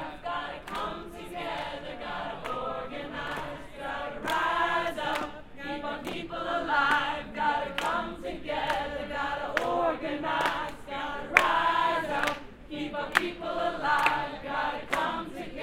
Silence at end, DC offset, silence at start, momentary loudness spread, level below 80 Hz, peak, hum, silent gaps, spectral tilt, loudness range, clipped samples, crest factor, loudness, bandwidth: 0 s; under 0.1%; 0 s; 12 LU; -52 dBFS; -2 dBFS; none; none; -4 dB/octave; 8 LU; under 0.1%; 28 dB; -30 LUFS; 16.5 kHz